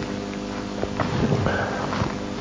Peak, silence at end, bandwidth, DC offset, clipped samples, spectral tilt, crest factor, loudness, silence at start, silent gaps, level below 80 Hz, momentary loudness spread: -6 dBFS; 0 s; 7.6 kHz; under 0.1%; under 0.1%; -6 dB/octave; 18 dB; -26 LUFS; 0 s; none; -40 dBFS; 8 LU